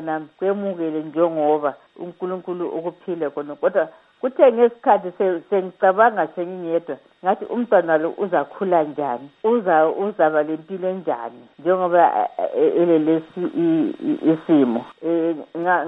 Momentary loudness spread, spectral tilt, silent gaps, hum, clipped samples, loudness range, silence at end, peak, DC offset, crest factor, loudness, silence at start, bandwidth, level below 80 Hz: 11 LU; -9.5 dB/octave; none; none; under 0.1%; 5 LU; 0 s; -2 dBFS; under 0.1%; 18 dB; -20 LUFS; 0 s; 4 kHz; -74 dBFS